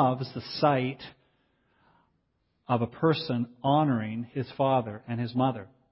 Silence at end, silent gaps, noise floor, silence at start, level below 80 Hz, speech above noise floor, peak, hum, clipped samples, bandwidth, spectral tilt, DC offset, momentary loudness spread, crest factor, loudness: 0.25 s; none; -74 dBFS; 0 s; -66 dBFS; 47 dB; -10 dBFS; none; under 0.1%; 5.8 kHz; -11 dB/octave; under 0.1%; 10 LU; 20 dB; -28 LUFS